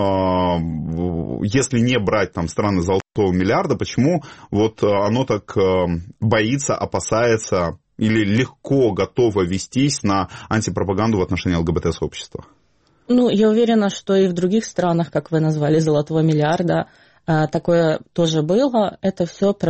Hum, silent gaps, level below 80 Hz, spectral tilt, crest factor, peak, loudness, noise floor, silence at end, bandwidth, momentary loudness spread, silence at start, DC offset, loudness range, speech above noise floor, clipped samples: none; none; -44 dBFS; -6 dB/octave; 16 dB; -2 dBFS; -19 LUFS; -59 dBFS; 0 s; 8.8 kHz; 6 LU; 0 s; 0.2%; 2 LU; 41 dB; under 0.1%